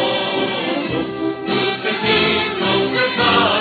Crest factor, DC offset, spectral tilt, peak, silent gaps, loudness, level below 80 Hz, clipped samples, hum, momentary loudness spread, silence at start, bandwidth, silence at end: 16 dB; under 0.1%; -7 dB/octave; -2 dBFS; none; -17 LUFS; -48 dBFS; under 0.1%; none; 7 LU; 0 s; 4.8 kHz; 0 s